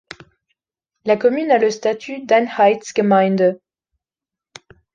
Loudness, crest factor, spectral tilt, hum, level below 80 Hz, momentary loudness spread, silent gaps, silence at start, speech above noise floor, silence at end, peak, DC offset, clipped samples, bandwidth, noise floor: -17 LUFS; 16 dB; -5.5 dB/octave; none; -66 dBFS; 9 LU; none; 1.05 s; 72 dB; 1.4 s; -2 dBFS; under 0.1%; under 0.1%; 9.4 kHz; -88 dBFS